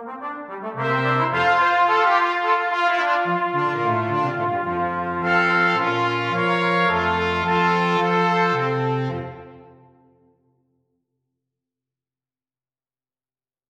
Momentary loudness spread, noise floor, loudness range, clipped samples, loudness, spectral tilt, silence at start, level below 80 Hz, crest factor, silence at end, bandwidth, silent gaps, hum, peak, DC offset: 8 LU; under -90 dBFS; 6 LU; under 0.1%; -20 LUFS; -6 dB/octave; 0 s; -56 dBFS; 16 dB; 4.05 s; 9 kHz; none; none; -6 dBFS; under 0.1%